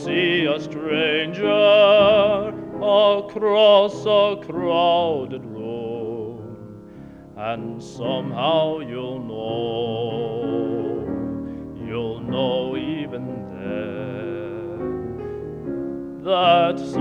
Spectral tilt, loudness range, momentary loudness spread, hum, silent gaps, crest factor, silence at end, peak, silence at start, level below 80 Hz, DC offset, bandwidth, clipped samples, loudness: -6.5 dB/octave; 12 LU; 16 LU; none; none; 18 dB; 0 s; -4 dBFS; 0 s; -52 dBFS; under 0.1%; 7.4 kHz; under 0.1%; -21 LUFS